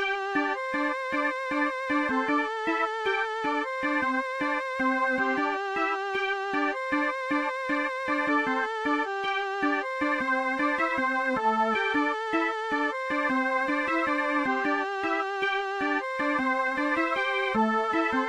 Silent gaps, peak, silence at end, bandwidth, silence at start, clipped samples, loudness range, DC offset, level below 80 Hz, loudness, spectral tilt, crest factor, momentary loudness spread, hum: none; -14 dBFS; 0 s; 10.5 kHz; 0 s; under 0.1%; 1 LU; under 0.1%; -64 dBFS; -27 LUFS; -4 dB/octave; 14 dB; 3 LU; none